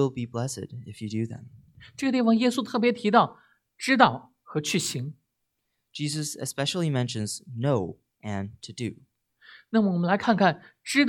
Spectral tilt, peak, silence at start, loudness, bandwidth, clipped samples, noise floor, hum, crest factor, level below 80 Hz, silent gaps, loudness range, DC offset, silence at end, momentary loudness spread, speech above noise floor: -5 dB/octave; -4 dBFS; 0 s; -26 LUFS; 17.5 kHz; under 0.1%; -79 dBFS; none; 24 dB; -68 dBFS; none; 6 LU; under 0.1%; 0 s; 16 LU; 53 dB